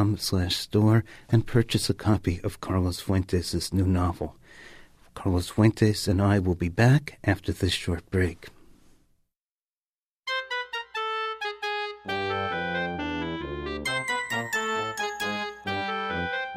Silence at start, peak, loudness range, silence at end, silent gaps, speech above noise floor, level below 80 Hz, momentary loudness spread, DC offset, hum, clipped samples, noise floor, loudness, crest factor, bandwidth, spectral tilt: 0 s; -8 dBFS; 8 LU; 0 s; 9.41-10.23 s; over 66 dB; -46 dBFS; 9 LU; under 0.1%; none; under 0.1%; under -90 dBFS; -27 LUFS; 18 dB; 15.5 kHz; -5.5 dB/octave